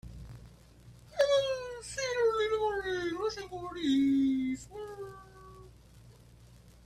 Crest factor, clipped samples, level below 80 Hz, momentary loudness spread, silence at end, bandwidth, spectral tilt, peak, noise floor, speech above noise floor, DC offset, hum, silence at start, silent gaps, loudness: 18 dB; under 0.1%; -58 dBFS; 23 LU; 0.15 s; 13 kHz; -4.5 dB/octave; -16 dBFS; -56 dBFS; 25 dB; under 0.1%; none; 0.05 s; none; -31 LUFS